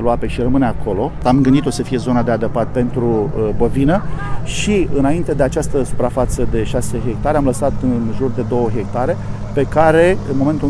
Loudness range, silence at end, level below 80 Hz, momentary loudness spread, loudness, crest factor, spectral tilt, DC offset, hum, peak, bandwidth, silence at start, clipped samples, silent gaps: 2 LU; 0 s; -26 dBFS; 7 LU; -17 LUFS; 14 dB; -6.5 dB/octave; under 0.1%; none; 0 dBFS; 11 kHz; 0 s; under 0.1%; none